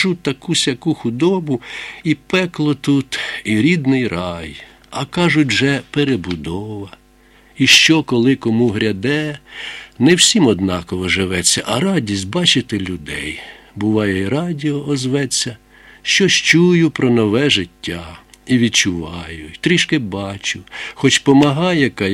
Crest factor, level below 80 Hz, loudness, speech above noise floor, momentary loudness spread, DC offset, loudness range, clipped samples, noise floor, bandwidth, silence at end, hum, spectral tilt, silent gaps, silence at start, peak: 16 dB; -46 dBFS; -15 LUFS; 33 dB; 15 LU; under 0.1%; 4 LU; under 0.1%; -49 dBFS; 15.5 kHz; 0 s; none; -4 dB/octave; none; 0 s; 0 dBFS